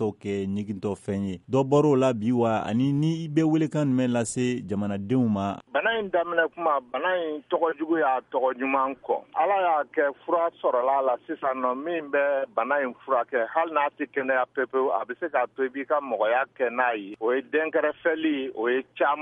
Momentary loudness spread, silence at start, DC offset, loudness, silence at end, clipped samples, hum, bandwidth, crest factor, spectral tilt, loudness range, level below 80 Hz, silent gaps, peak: 6 LU; 0 s; under 0.1%; -26 LUFS; 0 s; under 0.1%; none; 11 kHz; 16 dB; -6.5 dB/octave; 2 LU; -68 dBFS; none; -8 dBFS